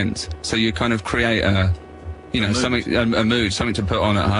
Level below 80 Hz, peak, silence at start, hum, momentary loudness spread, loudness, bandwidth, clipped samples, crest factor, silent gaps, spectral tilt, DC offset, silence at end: -38 dBFS; -4 dBFS; 0 s; none; 8 LU; -20 LUFS; 11 kHz; under 0.1%; 16 dB; none; -5 dB/octave; under 0.1%; 0 s